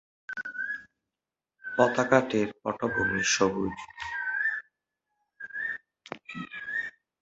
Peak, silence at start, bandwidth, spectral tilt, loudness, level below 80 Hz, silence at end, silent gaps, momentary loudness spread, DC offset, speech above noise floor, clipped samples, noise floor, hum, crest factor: -4 dBFS; 0.3 s; 8 kHz; -3.5 dB/octave; -29 LUFS; -60 dBFS; 0.3 s; none; 16 LU; under 0.1%; 63 dB; under 0.1%; -90 dBFS; none; 26 dB